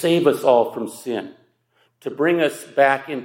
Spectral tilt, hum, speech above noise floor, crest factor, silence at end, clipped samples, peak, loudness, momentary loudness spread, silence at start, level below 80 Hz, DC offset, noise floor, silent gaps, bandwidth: -5 dB/octave; none; 45 dB; 18 dB; 0 s; under 0.1%; -2 dBFS; -19 LUFS; 15 LU; 0 s; -76 dBFS; under 0.1%; -64 dBFS; none; 16.5 kHz